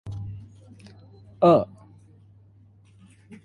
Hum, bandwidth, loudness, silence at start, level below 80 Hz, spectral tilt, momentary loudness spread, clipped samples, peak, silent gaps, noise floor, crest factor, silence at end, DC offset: none; 10.5 kHz; -22 LUFS; 0.05 s; -54 dBFS; -9 dB/octave; 21 LU; under 0.1%; -6 dBFS; none; -54 dBFS; 22 dB; 0.1 s; under 0.1%